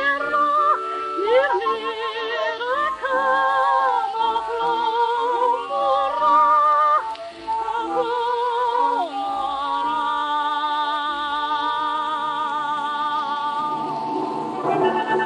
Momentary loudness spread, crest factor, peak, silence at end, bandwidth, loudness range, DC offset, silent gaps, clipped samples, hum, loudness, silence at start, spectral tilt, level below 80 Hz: 7 LU; 14 dB; -6 dBFS; 0 s; 10.5 kHz; 4 LU; under 0.1%; none; under 0.1%; none; -21 LUFS; 0 s; -4 dB/octave; -62 dBFS